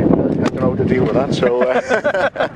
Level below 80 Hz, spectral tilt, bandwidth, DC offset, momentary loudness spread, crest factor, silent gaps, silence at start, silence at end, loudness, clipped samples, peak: -40 dBFS; -7 dB/octave; 10 kHz; under 0.1%; 3 LU; 16 dB; none; 0 s; 0 s; -16 LUFS; under 0.1%; 0 dBFS